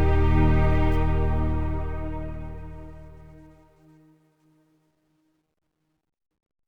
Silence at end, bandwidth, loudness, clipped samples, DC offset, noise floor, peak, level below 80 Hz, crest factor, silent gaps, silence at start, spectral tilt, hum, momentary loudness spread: 0 s; 5 kHz; -25 LUFS; under 0.1%; under 0.1%; -70 dBFS; -8 dBFS; -30 dBFS; 16 dB; none; 0 s; -9.5 dB/octave; none; 22 LU